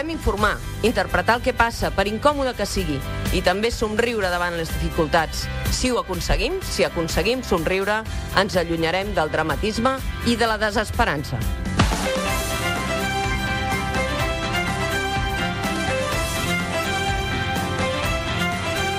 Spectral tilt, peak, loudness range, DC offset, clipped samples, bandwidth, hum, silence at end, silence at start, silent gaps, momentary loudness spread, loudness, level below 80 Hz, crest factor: -4.5 dB/octave; -2 dBFS; 1 LU; under 0.1%; under 0.1%; 15.5 kHz; none; 0 s; 0 s; none; 4 LU; -22 LUFS; -32 dBFS; 20 dB